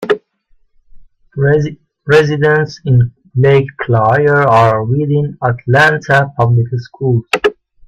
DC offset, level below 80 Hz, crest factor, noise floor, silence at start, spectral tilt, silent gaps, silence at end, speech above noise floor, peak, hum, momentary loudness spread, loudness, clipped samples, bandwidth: under 0.1%; -46 dBFS; 12 dB; -52 dBFS; 0 s; -7 dB/octave; none; 0.35 s; 41 dB; 0 dBFS; none; 8 LU; -12 LUFS; under 0.1%; 10 kHz